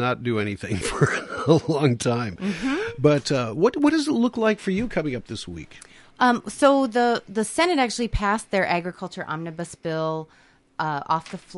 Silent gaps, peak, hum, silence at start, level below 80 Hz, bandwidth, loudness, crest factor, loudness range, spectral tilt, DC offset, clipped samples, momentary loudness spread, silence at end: none; -4 dBFS; none; 0 s; -44 dBFS; 11.5 kHz; -23 LUFS; 18 dB; 4 LU; -5.5 dB/octave; under 0.1%; under 0.1%; 12 LU; 0 s